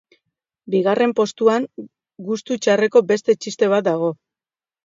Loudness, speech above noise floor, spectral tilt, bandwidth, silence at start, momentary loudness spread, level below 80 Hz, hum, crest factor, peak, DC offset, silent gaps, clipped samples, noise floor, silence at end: -19 LUFS; over 72 dB; -5 dB/octave; 7.8 kHz; 0.65 s; 13 LU; -72 dBFS; none; 18 dB; -2 dBFS; under 0.1%; none; under 0.1%; under -90 dBFS; 0.7 s